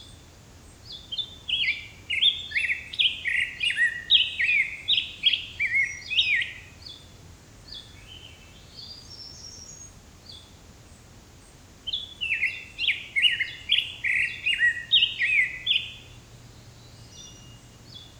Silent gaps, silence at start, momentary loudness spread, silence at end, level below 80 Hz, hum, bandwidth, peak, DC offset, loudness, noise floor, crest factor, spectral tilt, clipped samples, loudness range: none; 0 s; 24 LU; 0 s; -56 dBFS; none; over 20 kHz; -6 dBFS; under 0.1%; -23 LUFS; -50 dBFS; 22 dB; 0 dB/octave; under 0.1%; 20 LU